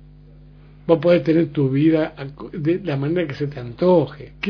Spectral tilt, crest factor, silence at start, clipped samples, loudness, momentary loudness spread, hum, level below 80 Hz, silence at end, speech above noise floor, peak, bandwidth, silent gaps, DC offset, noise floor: -9.5 dB/octave; 18 dB; 0.9 s; under 0.1%; -19 LUFS; 12 LU; 50 Hz at -45 dBFS; -48 dBFS; 0 s; 25 dB; -2 dBFS; 5.4 kHz; none; under 0.1%; -44 dBFS